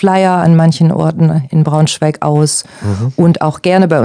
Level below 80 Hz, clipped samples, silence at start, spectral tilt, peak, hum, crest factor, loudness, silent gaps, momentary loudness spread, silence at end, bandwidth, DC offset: -50 dBFS; 1%; 0 s; -6 dB/octave; 0 dBFS; none; 10 dB; -11 LUFS; none; 6 LU; 0 s; 10 kHz; under 0.1%